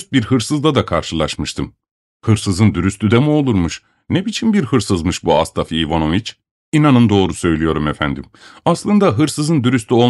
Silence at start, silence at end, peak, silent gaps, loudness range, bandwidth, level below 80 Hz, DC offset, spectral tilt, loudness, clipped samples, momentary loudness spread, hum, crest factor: 0 s; 0 s; -2 dBFS; 1.91-2.20 s, 6.51-6.72 s; 2 LU; 12 kHz; -38 dBFS; under 0.1%; -6 dB/octave; -16 LUFS; under 0.1%; 8 LU; none; 14 dB